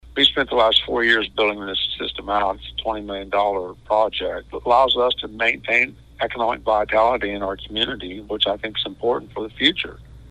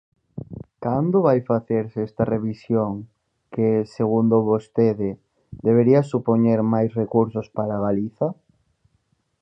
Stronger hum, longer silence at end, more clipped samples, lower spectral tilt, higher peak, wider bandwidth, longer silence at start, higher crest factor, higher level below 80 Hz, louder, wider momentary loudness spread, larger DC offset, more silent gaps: neither; second, 0 s vs 1.1 s; neither; second, -4.5 dB/octave vs -10.5 dB/octave; first, 0 dBFS vs -4 dBFS; first, 10.5 kHz vs 7.8 kHz; second, 0.05 s vs 0.35 s; about the same, 20 dB vs 18 dB; first, -44 dBFS vs -56 dBFS; about the same, -20 LUFS vs -21 LUFS; about the same, 11 LU vs 12 LU; neither; neither